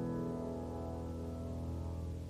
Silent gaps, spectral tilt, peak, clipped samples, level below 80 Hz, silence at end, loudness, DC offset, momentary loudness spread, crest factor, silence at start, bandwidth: none; -8.5 dB/octave; -30 dBFS; under 0.1%; -50 dBFS; 0 s; -42 LUFS; under 0.1%; 3 LU; 12 dB; 0 s; 14.5 kHz